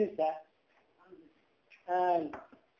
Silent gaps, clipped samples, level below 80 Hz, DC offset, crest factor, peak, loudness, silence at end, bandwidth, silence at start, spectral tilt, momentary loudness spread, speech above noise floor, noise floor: none; under 0.1%; -78 dBFS; under 0.1%; 18 dB; -18 dBFS; -33 LUFS; 0.35 s; 6.8 kHz; 0 s; -7.5 dB/octave; 19 LU; 39 dB; -71 dBFS